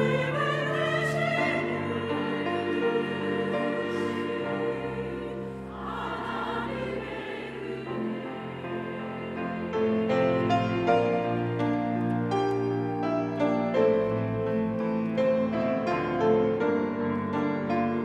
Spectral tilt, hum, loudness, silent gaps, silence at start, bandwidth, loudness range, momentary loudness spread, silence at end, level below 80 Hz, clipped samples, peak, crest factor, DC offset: -7 dB/octave; none; -28 LUFS; none; 0 s; 11.5 kHz; 7 LU; 10 LU; 0 s; -58 dBFS; under 0.1%; -10 dBFS; 18 dB; under 0.1%